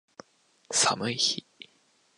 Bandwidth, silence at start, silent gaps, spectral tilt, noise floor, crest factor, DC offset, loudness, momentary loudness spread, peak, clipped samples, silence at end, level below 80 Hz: 11.5 kHz; 0.7 s; none; -1 dB/octave; -66 dBFS; 22 dB; under 0.1%; -26 LUFS; 6 LU; -10 dBFS; under 0.1%; 0.55 s; -74 dBFS